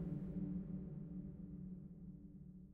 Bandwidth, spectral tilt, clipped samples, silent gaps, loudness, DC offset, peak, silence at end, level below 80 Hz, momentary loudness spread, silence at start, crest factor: 2.6 kHz; -13 dB/octave; under 0.1%; none; -50 LUFS; under 0.1%; -34 dBFS; 0 s; -60 dBFS; 11 LU; 0 s; 14 dB